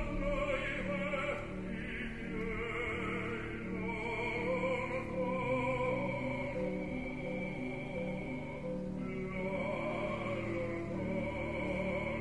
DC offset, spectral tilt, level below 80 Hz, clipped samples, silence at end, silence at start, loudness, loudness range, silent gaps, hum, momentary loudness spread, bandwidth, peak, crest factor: 0.2%; -7 dB/octave; -50 dBFS; under 0.1%; 0 s; 0 s; -37 LUFS; 3 LU; none; none; 6 LU; 11 kHz; -22 dBFS; 16 dB